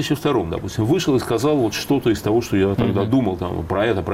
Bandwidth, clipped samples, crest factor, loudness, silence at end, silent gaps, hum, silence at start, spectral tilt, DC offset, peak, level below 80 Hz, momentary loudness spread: 16 kHz; under 0.1%; 12 dB; -20 LUFS; 0 s; none; none; 0 s; -6 dB/octave; under 0.1%; -8 dBFS; -42 dBFS; 5 LU